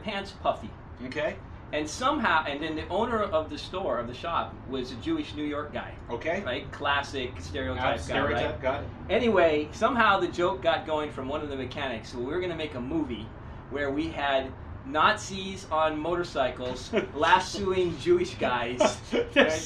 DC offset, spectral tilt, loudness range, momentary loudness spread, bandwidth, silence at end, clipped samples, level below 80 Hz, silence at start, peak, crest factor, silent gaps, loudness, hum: under 0.1%; -4.5 dB/octave; 6 LU; 12 LU; 11.5 kHz; 0 s; under 0.1%; -48 dBFS; 0 s; -6 dBFS; 22 dB; none; -28 LUFS; none